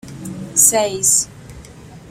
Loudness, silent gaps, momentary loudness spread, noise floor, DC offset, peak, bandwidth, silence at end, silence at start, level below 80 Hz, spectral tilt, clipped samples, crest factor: -13 LUFS; none; 18 LU; -38 dBFS; under 0.1%; 0 dBFS; 16.5 kHz; 0 s; 0.05 s; -48 dBFS; -2 dB/octave; under 0.1%; 20 dB